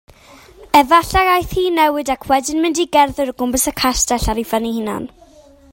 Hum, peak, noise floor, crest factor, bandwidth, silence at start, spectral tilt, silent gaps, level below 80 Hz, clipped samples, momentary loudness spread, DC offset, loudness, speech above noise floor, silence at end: none; 0 dBFS; -45 dBFS; 16 dB; 16.5 kHz; 0.6 s; -3 dB/octave; none; -34 dBFS; under 0.1%; 9 LU; under 0.1%; -16 LUFS; 30 dB; 0.65 s